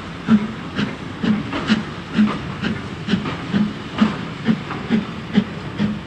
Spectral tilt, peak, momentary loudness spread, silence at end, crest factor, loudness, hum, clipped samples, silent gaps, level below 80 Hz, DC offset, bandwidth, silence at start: -6.5 dB/octave; -2 dBFS; 6 LU; 0 s; 18 dB; -22 LUFS; none; under 0.1%; none; -44 dBFS; under 0.1%; 8.8 kHz; 0 s